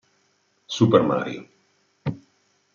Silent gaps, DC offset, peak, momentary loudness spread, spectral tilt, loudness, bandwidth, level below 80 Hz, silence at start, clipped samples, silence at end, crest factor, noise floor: none; under 0.1%; -4 dBFS; 18 LU; -6.5 dB/octave; -23 LUFS; 7.4 kHz; -62 dBFS; 0.7 s; under 0.1%; 0.6 s; 22 dB; -67 dBFS